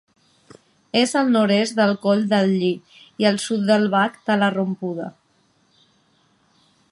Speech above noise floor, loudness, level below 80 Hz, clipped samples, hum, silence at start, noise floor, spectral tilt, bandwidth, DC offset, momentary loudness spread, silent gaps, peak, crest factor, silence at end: 43 dB; -20 LUFS; -70 dBFS; under 0.1%; none; 0.95 s; -62 dBFS; -5 dB/octave; 11.5 kHz; under 0.1%; 9 LU; none; -4 dBFS; 18 dB; 1.8 s